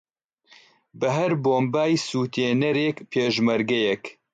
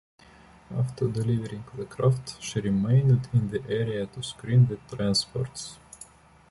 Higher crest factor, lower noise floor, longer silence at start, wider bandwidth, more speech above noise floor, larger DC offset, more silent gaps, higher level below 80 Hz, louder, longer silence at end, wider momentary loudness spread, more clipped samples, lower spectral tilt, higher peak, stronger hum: about the same, 14 dB vs 16 dB; first, -59 dBFS vs -53 dBFS; first, 0.95 s vs 0.7 s; second, 9.2 kHz vs 11.5 kHz; first, 36 dB vs 27 dB; neither; neither; second, -68 dBFS vs -54 dBFS; first, -23 LUFS vs -27 LUFS; second, 0.25 s vs 0.45 s; second, 4 LU vs 16 LU; neither; about the same, -5.5 dB/octave vs -6.5 dB/octave; about the same, -10 dBFS vs -10 dBFS; neither